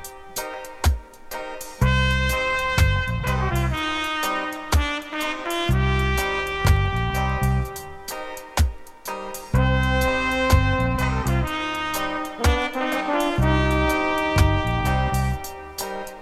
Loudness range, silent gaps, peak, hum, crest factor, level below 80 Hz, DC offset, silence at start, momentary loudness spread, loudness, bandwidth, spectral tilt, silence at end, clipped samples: 2 LU; none; -6 dBFS; none; 18 dB; -28 dBFS; under 0.1%; 0 s; 12 LU; -23 LUFS; 15.5 kHz; -5 dB/octave; 0 s; under 0.1%